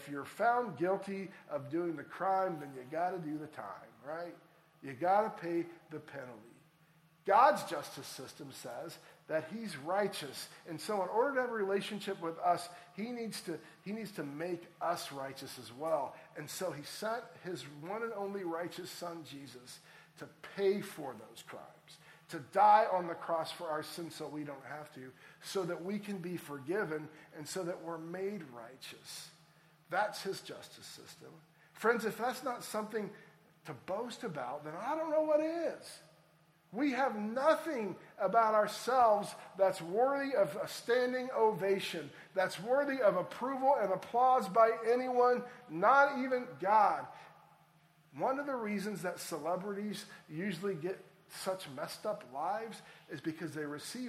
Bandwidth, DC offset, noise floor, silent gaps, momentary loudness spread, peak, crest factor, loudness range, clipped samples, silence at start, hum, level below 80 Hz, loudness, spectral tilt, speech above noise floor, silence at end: 16 kHz; under 0.1%; -68 dBFS; none; 19 LU; -14 dBFS; 22 dB; 10 LU; under 0.1%; 0 s; none; -84 dBFS; -35 LUFS; -4.5 dB/octave; 32 dB; 0 s